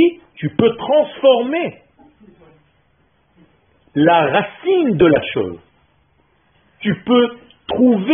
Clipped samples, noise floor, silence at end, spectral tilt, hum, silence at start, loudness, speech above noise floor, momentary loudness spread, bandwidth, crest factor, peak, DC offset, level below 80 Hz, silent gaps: under 0.1%; -59 dBFS; 0 s; -3.5 dB/octave; none; 0 s; -16 LUFS; 45 dB; 13 LU; 3.7 kHz; 16 dB; 0 dBFS; under 0.1%; -52 dBFS; none